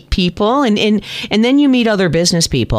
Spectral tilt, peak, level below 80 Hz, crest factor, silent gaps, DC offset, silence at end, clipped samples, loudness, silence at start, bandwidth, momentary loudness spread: -4.5 dB/octave; -2 dBFS; -30 dBFS; 12 dB; none; under 0.1%; 0 s; under 0.1%; -13 LUFS; 0.1 s; 14.5 kHz; 5 LU